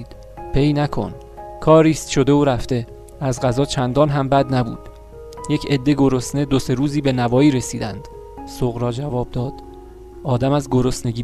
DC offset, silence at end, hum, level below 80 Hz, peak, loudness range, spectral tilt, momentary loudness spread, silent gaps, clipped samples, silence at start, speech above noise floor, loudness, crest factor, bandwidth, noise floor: under 0.1%; 0 s; none; -36 dBFS; 0 dBFS; 5 LU; -6.5 dB/octave; 20 LU; none; under 0.1%; 0 s; 20 dB; -19 LUFS; 18 dB; 14 kHz; -38 dBFS